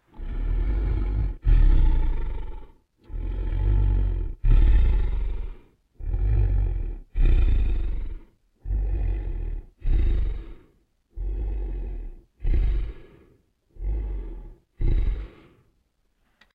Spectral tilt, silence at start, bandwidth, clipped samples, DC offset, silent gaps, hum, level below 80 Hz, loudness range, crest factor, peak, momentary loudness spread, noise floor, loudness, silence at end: -9.5 dB/octave; 0.15 s; 4 kHz; under 0.1%; under 0.1%; none; none; -24 dBFS; 7 LU; 16 dB; -8 dBFS; 18 LU; -68 dBFS; -28 LUFS; 1.3 s